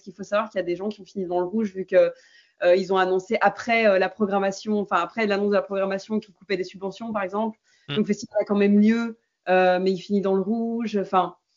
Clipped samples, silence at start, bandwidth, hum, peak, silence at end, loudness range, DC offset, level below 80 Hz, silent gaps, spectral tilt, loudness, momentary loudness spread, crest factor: under 0.1%; 0.05 s; 7.6 kHz; none; -6 dBFS; 0.25 s; 4 LU; under 0.1%; -72 dBFS; none; -6.5 dB/octave; -23 LUFS; 10 LU; 18 dB